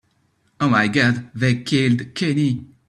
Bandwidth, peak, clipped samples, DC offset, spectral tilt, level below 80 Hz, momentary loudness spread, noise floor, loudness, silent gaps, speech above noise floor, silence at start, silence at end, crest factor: 11 kHz; -2 dBFS; under 0.1%; under 0.1%; -6 dB/octave; -56 dBFS; 5 LU; -64 dBFS; -19 LUFS; none; 45 dB; 0.6 s; 0.25 s; 18 dB